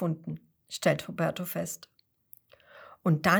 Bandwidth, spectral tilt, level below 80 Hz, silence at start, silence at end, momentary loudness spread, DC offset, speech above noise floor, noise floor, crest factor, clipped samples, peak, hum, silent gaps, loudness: over 20 kHz; -5.5 dB/octave; -66 dBFS; 0 s; 0 s; 15 LU; under 0.1%; 30 dB; -59 dBFS; 24 dB; under 0.1%; -8 dBFS; none; none; -32 LUFS